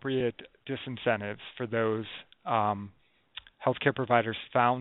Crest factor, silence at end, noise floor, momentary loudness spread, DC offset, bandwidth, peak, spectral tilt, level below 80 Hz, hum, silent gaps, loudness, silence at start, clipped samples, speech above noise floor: 22 dB; 0 s; -51 dBFS; 18 LU; under 0.1%; 4.1 kHz; -8 dBFS; -4 dB/octave; -68 dBFS; none; none; -30 LUFS; 0.05 s; under 0.1%; 21 dB